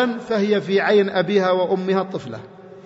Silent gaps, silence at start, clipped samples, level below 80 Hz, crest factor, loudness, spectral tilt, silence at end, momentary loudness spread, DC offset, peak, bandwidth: none; 0 s; under 0.1%; -66 dBFS; 14 dB; -19 LUFS; -6.5 dB/octave; 0.05 s; 13 LU; under 0.1%; -6 dBFS; 8 kHz